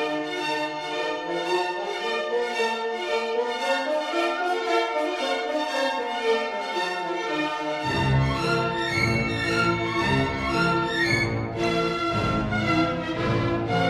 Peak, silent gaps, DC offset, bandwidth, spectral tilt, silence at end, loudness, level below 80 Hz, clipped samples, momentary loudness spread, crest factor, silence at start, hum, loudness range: -10 dBFS; none; under 0.1%; 14 kHz; -5.5 dB/octave; 0 s; -25 LUFS; -44 dBFS; under 0.1%; 5 LU; 16 dB; 0 s; none; 3 LU